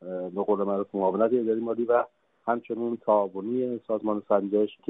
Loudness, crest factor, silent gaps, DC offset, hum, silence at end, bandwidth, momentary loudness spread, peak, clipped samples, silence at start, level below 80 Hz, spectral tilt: -27 LUFS; 18 dB; none; under 0.1%; none; 0.15 s; 3.9 kHz; 6 LU; -10 dBFS; under 0.1%; 0 s; -72 dBFS; -11 dB/octave